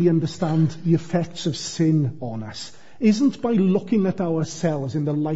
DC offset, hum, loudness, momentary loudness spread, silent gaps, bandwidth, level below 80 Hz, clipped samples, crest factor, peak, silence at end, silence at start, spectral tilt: 0.9%; none; -22 LUFS; 11 LU; none; 8 kHz; -58 dBFS; under 0.1%; 14 dB; -6 dBFS; 0 s; 0 s; -7 dB/octave